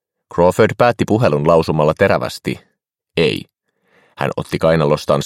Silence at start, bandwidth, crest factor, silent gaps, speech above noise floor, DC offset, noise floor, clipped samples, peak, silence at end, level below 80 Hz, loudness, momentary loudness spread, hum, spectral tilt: 0.35 s; 16.5 kHz; 16 dB; none; 44 dB; under 0.1%; -58 dBFS; under 0.1%; 0 dBFS; 0 s; -44 dBFS; -16 LUFS; 12 LU; none; -6.5 dB/octave